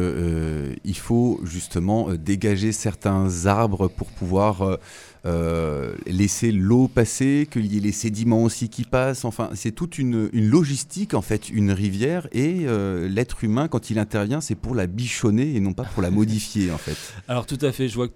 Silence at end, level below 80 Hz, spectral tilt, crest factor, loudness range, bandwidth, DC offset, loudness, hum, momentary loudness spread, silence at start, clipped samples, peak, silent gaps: 0.05 s; -42 dBFS; -6 dB/octave; 20 dB; 3 LU; 16.5 kHz; under 0.1%; -23 LUFS; none; 8 LU; 0 s; under 0.1%; -2 dBFS; none